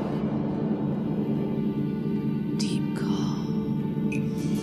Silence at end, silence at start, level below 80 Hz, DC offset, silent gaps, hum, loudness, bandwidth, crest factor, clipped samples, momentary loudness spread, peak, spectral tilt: 0 s; 0 s; -52 dBFS; under 0.1%; none; none; -28 LUFS; 13 kHz; 12 dB; under 0.1%; 1 LU; -14 dBFS; -7.5 dB/octave